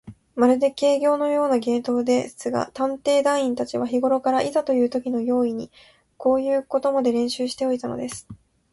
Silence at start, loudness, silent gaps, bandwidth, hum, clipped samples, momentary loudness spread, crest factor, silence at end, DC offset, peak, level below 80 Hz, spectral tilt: 0.05 s; -22 LUFS; none; 11.5 kHz; none; under 0.1%; 7 LU; 16 dB; 0.4 s; under 0.1%; -6 dBFS; -62 dBFS; -4.5 dB/octave